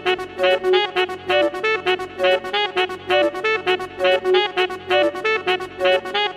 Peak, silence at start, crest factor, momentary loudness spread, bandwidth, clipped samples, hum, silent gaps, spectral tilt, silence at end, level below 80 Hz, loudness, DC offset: -4 dBFS; 0 s; 16 dB; 5 LU; 13.5 kHz; under 0.1%; none; none; -3.5 dB/octave; 0 s; -58 dBFS; -19 LUFS; under 0.1%